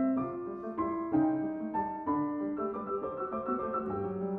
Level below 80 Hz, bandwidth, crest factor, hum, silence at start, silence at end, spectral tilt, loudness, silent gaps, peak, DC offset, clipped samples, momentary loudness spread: -64 dBFS; 3.4 kHz; 16 dB; none; 0 s; 0 s; -11.5 dB/octave; -34 LUFS; none; -18 dBFS; under 0.1%; under 0.1%; 6 LU